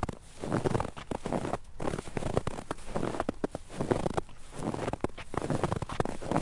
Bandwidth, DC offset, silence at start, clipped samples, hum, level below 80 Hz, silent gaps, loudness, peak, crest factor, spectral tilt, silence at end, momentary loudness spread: 11.5 kHz; under 0.1%; 0 s; under 0.1%; none; -46 dBFS; none; -35 LUFS; -12 dBFS; 22 dB; -6.5 dB/octave; 0 s; 7 LU